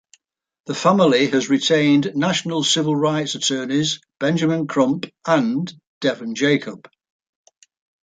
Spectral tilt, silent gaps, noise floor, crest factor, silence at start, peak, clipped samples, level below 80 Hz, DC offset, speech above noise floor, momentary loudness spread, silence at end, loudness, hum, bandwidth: -4.5 dB/octave; 5.87-6.01 s; -58 dBFS; 18 dB; 0.7 s; -2 dBFS; under 0.1%; -66 dBFS; under 0.1%; 39 dB; 8 LU; 1.3 s; -19 LUFS; none; 9.4 kHz